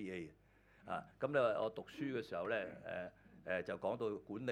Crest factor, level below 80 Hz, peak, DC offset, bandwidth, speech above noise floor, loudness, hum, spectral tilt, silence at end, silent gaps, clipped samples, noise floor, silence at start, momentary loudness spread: 20 dB; -74 dBFS; -22 dBFS; under 0.1%; 12 kHz; 28 dB; -42 LUFS; none; -6.5 dB/octave; 0 s; none; under 0.1%; -69 dBFS; 0 s; 14 LU